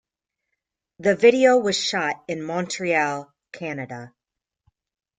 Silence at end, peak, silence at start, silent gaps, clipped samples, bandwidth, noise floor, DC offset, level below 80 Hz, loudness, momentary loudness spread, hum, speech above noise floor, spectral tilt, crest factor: 1.1 s; -2 dBFS; 1 s; none; under 0.1%; 9.4 kHz; -86 dBFS; under 0.1%; -68 dBFS; -21 LUFS; 18 LU; none; 65 dB; -4 dB/octave; 22 dB